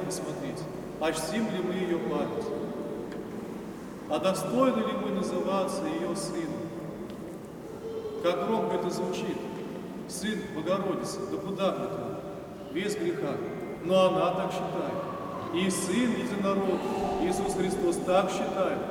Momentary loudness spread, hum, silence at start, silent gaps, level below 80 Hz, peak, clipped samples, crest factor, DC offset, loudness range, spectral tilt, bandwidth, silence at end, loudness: 12 LU; none; 0 s; none; -58 dBFS; -12 dBFS; under 0.1%; 18 dB; under 0.1%; 5 LU; -5 dB/octave; 19 kHz; 0 s; -30 LUFS